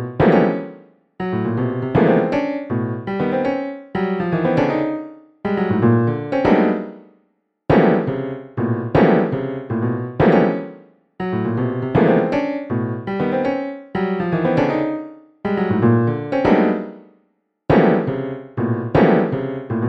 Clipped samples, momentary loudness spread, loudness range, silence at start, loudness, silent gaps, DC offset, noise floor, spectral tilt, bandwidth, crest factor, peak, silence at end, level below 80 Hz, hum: under 0.1%; 12 LU; 2 LU; 0 s; -19 LUFS; none; under 0.1%; -65 dBFS; -9.5 dB/octave; 6.2 kHz; 16 dB; -2 dBFS; 0 s; -46 dBFS; none